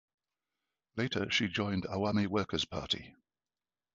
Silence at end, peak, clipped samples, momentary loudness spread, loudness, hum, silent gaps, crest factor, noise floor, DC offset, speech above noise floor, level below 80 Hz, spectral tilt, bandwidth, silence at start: 0.9 s; -16 dBFS; under 0.1%; 5 LU; -33 LUFS; none; none; 20 dB; under -90 dBFS; under 0.1%; over 56 dB; -58 dBFS; -3.5 dB/octave; 7.4 kHz; 0.95 s